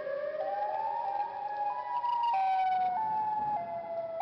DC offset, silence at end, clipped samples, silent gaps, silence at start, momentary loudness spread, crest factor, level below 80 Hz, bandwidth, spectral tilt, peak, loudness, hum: under 0.1%; 0 s; under 0.1%; none; 0 s; 7 LU; 8 dB; -74 dBFS; 6 kHz; -5.5 dB/octave; -26 dBFS; -32 LUFS; none